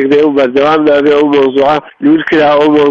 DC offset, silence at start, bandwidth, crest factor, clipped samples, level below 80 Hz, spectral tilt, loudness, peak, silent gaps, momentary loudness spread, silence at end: under 0.1%; 0 s; 7 kHz; 8 dB; under 0.1%; -46 dBFS; -6.5 dB/octave; -8 LUFS; 0 dBFS; none; 3 LU; 0 s